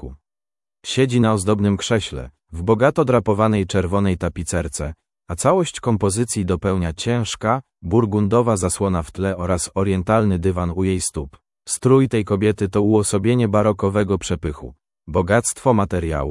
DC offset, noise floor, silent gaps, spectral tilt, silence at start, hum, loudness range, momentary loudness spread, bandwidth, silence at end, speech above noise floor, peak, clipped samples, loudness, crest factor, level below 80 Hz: under 0.1%; under -90 dBFS; none; -5.5 dB/octave; 0 s; none; 3 LU; 9 LU; 12 kHz; 0 s; over 71 dB; -2 dBFS; under 0.1%; -19 LUFS; 18 dB; -42 dBFS